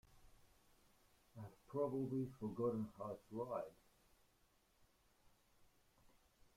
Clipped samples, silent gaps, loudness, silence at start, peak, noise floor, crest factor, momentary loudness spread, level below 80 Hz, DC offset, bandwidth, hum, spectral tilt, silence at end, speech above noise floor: under 0.1%; none; -46 LUFS; 0.1 s; -30 dBFS; -77 dBFS; 20 dB; 16 LU; -76 dBFS; under 0.1%; 16 kHz; none; -9 dB/octave; 2.85 s; 32 dB